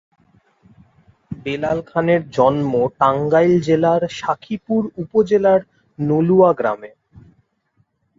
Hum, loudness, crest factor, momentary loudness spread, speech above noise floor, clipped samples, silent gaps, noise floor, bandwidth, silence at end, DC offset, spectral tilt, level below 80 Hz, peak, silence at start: none; -17 LUFS; 16 dB; 10 LU; 48 dB; under 0.1%; none; -64 dBFS; 7.6 kHz; 1.3 s; under 0.1%; -7.5 dB/octave; -54 dBFS; -2 dBFS; 1.3 s